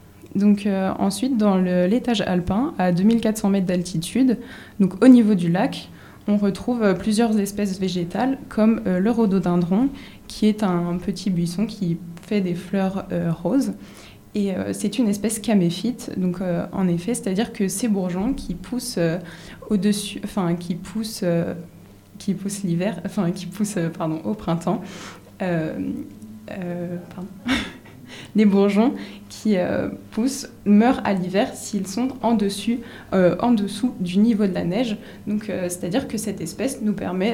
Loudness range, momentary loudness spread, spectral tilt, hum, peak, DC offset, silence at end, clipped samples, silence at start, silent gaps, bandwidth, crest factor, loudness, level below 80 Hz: 7 LU; 11 LU; -6 dB/octave; none; -2 dBFS; under 0.1%; 0 s; under 0.1%; 0.25 s; none; 15.5 kHz; 20 dB; -22 LUFS; -48 dBFS